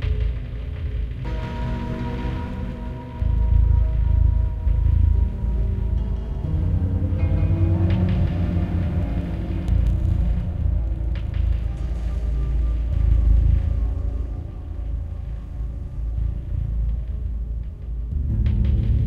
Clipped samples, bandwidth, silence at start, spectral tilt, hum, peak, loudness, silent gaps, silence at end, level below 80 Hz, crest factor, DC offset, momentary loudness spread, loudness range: under 0.1%; 4.2 kHz; 0 s; -9.5 dB/octave; none; -6 dBFS; -24 LUFS; none; 0 s; -22 dBFS; 14 dB; under 0.1%; 11 LU; 7 LU